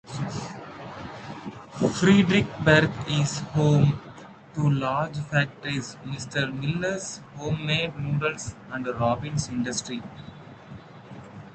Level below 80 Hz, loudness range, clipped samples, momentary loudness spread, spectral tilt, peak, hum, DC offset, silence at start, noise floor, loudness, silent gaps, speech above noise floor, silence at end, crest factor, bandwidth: -52 dBFS; 6 LU; under 0.1%; 24 LU; -5.5 dB/octave; -2 dBFS; none; under 0.1%; 0.05 s; -45 dBFS; -25 LUFS; none; 20 dB; 0 s; 24 dB; 9 kHz